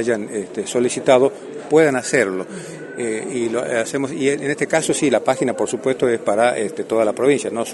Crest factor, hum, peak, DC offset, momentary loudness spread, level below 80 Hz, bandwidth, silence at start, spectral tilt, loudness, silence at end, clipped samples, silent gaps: 18 dB; none; -2 dBFS; under 0.1%; 10 LU; -62 dBFS; 11.5 kHz; 0 s; -4.5 dB/octave; -19 LUFS; 0 s; under 0.1%; none